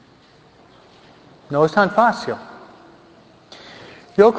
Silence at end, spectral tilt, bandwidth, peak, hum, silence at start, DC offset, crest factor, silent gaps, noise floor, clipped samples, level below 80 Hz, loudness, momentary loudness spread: 0 s; -6.5 dB/octave; 8 kHz; 0 dBFS; none; 1.5 s; under 0.1%; 22 dB; none; -50 dBFS; under 0.1%; -60 dBFS; -18 LUFS; 25 LU